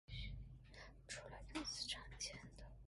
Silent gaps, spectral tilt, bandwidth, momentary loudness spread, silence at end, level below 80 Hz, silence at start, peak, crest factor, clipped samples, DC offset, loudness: none; -2.5 dB/octave; 11.5 kHz; 14 LU; 0 s; -58 dBFS; 0.1 s; -34 dBFS; 18 dB; under 0.1%; under 0.1%; -50 LUFS